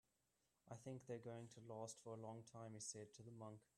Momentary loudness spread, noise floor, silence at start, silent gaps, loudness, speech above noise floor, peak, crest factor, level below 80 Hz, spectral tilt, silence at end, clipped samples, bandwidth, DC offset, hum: 6 LU; -88 dBFS; 0.65 s; none; -56 LUFS; 32 dB; -38 dBFS; 18 dB; -90 dBFS; -5 dB/octave; 0.15 s; under 0.1%; 13 kHz; under 0.1%; none